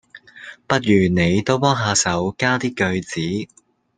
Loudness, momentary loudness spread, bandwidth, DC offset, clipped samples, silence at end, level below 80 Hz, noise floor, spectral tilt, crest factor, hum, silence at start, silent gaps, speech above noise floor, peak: -19 LUFS; 18 LU; 9.8 kHz; under 0.1%; under 0.1%; 0.5 s; -52 dBFS; -41 dBFS; -4.5 dB/octave; 18 dB; none; 0.15 s; none; 23 dB; -2 dBFS